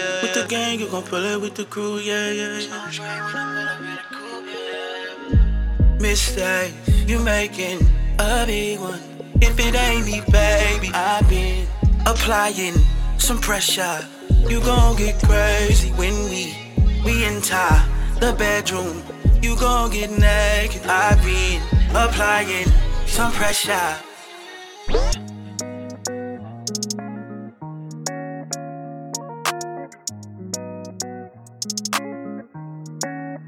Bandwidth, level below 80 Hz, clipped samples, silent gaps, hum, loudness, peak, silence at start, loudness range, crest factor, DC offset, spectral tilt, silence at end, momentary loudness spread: 17 kHz; -22 dBFS; under 0.1%; none; none; -20 LUFS; -2 dBFS; 0 s; 11 LU; 18 dB; under 0.1%; -4 dB/octave; 0 s; 15 LU